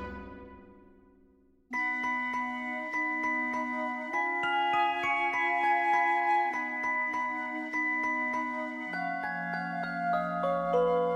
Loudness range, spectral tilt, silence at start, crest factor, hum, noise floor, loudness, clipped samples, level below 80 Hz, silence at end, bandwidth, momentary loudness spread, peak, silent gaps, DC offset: 5 LU; -5 dB/octave; 0 s; 16 dB; none; -63 dBFS; -30 LUFS; under 0.1%; -62 dBFS; 0 s; 12 kHz; 8 LU; -16 dBFS; none; under 0.1%